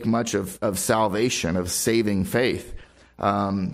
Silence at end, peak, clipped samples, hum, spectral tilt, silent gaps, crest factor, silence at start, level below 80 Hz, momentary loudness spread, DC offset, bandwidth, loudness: 0 s; -8 dBFS; under 0.1%; none; -4.5 dB/octave; none; 16 dB; 0 s; -48 dBFS; 5 LU; under 0.1%; 16 kHz; -23 LUFS